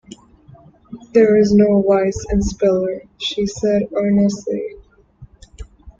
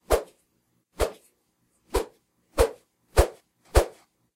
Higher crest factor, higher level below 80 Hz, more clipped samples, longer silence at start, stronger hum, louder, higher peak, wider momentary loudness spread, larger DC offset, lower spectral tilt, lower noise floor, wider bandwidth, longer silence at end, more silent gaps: second, 16 dB vs 26 dB; about the same, -36 dBFS vs -32 dBFS; neither; first, 0.9 s vs 0.1 s; neither; first, -17 LUFS vs -27 LUFS; about the same, -2 dBFS vs -2 dBFS; first, 12 LU vs 9 LU; neither; first, -6.5 dB/octave vs -5 dB/octave; second, -46 dBFS vs -71 dBFS; second, 7.6 kHz vs 16 kHz; second, 0.1 s vs 0.45 s; neither